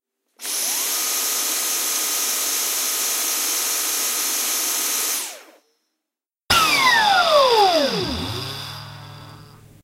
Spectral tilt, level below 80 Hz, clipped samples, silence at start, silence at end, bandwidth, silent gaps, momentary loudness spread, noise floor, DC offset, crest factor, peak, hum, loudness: -0.5 dB/octave; -50 dBFS; under 0.1%; 0.4 s; 0.3 s; 16 kHz; none; 15 LU; -86 dBFS; under 0.1%; 18 dB; -2 dBFS; none; -18 LUFS